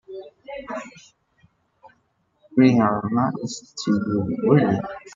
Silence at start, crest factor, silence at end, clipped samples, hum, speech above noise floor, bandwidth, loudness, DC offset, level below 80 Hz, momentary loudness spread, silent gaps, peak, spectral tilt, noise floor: 0.1 s; 20 dB; 0.05 s; under 0.1%; none; 47 dB; 7.6 kHz; -21 LUFS; under 0.1%; -60 dBFS; 20 LU; none; -4 dBFS; -7 dB/octave; -67 dBFS